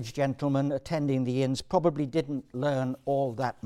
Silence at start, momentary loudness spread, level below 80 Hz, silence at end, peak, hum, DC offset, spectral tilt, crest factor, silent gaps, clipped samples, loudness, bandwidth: 0 s; 4 LU; -58 dBFS; 0.15 s; -10 dBFS; none; under 0.1%; -7 dB/octave; 18 dB; none; under 0.1%; -29 LUFS; 13 kHz